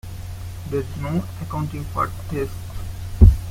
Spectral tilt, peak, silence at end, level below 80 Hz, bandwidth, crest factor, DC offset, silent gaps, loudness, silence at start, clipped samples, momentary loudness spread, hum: -8 dB/octave; -2 dBFS; 0 s; -24 dBFS; 16 kHz; 20 dB; under 0.1%; none; -23 LUFS; 0.05 s; under 0.1%; 18 LU; none